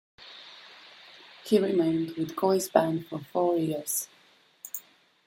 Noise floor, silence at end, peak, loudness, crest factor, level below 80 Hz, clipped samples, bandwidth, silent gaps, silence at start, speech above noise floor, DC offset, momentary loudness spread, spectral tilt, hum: -51 dBFS; 0.5 s; -6 dBFS; -28 LUFS; 24 dB; -74 dBFS; under 0.1%; 16.5 kHz; none; 0.2 s; 25 dB; under 0.1%; 23 LU; -5 dB/octave; none